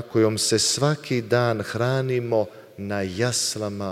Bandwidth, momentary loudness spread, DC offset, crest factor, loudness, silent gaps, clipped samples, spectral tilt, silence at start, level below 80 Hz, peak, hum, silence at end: 16 kHz; 9 LU; under 0.1%; 18 dB; -23 LUFS; none; under 0.1%; -4 dB/octave; 0 s; -60 dBFS; -6 dBFS; none; 0 s